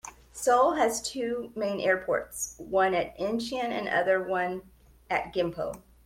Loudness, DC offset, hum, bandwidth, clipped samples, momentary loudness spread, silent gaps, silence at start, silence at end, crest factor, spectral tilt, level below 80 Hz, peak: -28 LUFS; under 0.1%; none; 16.5 kHz; under 0.1%; 10 LU; none; 0.05 s; 0.25 s; 16 dB; -3.5 dB/octave; -58 dBFS; -12 dBFS